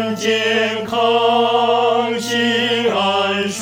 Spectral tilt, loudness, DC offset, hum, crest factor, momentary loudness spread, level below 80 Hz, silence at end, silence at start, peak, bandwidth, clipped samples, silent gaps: -3.5 dB/octave; -16 LUFS; under 0.1%; none; 12 dB; 4 LU; -64 dBFS; 0 s; 0 s; -4 dBFS; 16.5 kHz; under 0.1%; none